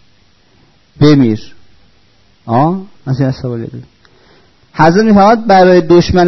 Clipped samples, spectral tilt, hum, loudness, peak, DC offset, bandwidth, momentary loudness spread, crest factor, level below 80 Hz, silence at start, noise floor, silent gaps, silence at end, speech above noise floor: under 0.1%; -7.5 dB/octave; none; -10 LUFS; 0 dBFS; under 0.1%; 6.2 kHz; 15 LU; 12 dB; -38 dBFS; 1 s; -50 dBFS; none; 0 s; 42 dB